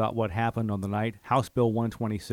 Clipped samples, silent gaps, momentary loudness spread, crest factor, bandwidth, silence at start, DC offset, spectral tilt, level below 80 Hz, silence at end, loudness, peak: under 0.1%; none; 5 LU; 16 dB; 15.5 kHz; 0 s; under 0.1%; -7.5 dB/octave; -54 dBFS; 0 s; -28 LUFS; -12 dBFS